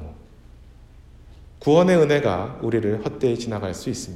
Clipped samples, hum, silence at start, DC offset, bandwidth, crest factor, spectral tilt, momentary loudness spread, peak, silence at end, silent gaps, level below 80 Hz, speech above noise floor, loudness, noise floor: under 0.1%; none; 0 s; under 0.1%; 13 kHz; 18 dB; -6.5 dB/octave; 12 LU; -4 dBFS; 0 s; none; -48 dBFS; 26 dB; -21 LUFS; -46 dBFS